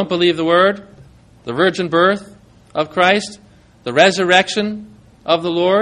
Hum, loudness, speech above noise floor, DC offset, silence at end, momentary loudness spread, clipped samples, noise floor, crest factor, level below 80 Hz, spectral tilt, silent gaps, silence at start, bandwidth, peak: none; -15 LUFS; 29 dB; under 0.1%; 0 s; 17 LU; under 0.1%; -45 dBFS; 16 dB; -56 dBFS; -4.5 dB/octave; none; 0 s; 10.5 kHz; 0 dBFS